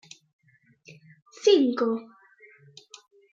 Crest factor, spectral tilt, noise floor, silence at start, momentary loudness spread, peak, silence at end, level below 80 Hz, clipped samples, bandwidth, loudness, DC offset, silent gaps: 20 dB; -4 dB/octave; -58 dBFS; 1.45 s; 27 LU; -8 dBFS; 1.3 s; -84 dBFS; under 0.1%; 7.8 kHz; -23 LUFS; under 0.1%; none